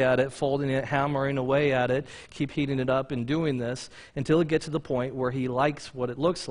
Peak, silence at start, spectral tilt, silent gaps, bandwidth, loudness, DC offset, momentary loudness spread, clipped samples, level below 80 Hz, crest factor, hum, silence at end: -10 dBFS; 0 s; -6.5 dB/octave; none; 11 kHz; -27 LUFS; under 0.1%; 9 LU; under 0.1%; -54 dBFS; 16 dB; none; 0 s